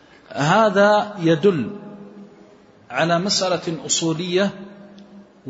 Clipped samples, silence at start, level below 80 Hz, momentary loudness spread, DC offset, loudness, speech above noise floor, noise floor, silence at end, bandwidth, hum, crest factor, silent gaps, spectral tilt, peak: under 0.1%; 0.3 s; -64 dBFS; 21 LU; under 0.1%; -19 LUFS; 30 dB; -48 dBFS; 0 s; 8 kHz; none; 16 dB; none; -4 dB/octave; -4 dBFS